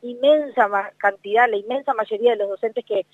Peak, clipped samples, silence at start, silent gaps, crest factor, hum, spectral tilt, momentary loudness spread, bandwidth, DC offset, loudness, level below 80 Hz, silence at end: -4 dBFS; under 0.1%; 0.05 s; none; 16 dB; none; -5 dB/octave; 6 LU; 7.6 kHz; under 0.1%; -20 LUFS; -86 dBFS; 0.1 s